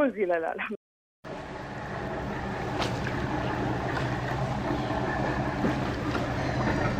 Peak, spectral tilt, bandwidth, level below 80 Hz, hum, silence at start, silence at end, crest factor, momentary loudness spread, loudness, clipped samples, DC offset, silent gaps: -14 dBFS; -6.5 dB/octave; 15.5 kHz; -44 dBFS; none; 0 s; 0 s; 16 dB; 10 LU; -30 LUFS; under 0.1%; under 0.1%; 0.77-1.23 s